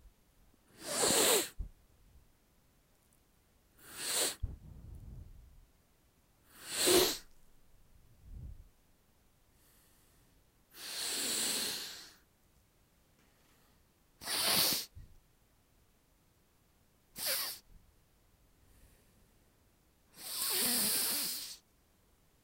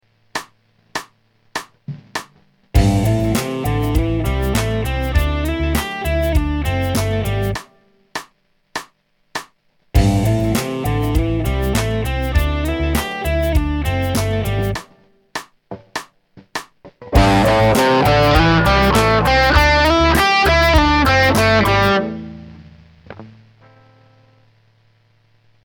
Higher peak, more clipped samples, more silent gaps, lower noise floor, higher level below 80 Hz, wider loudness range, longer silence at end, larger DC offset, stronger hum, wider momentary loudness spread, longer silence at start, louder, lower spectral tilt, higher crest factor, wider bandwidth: second, -12 dBFS vs 0 dBFS; neither; neither; first, -70 dBFS vs -58 dBFS; second, -58 dBFS vs -24 dBFS; about the same, 8 LU vs 10 LU; second, 0.85 s vs 2.35 s; neither; neither; first, 25 LU vs 17 LU; second, 0.05 s vs 0.35 s; second, -32 LUFS vs -16 LUFS; second, -1 dB/octave vs -5.5 dB/octave; first, 28 dB vs 18 dB; second, 16 kHz vs 19 kHz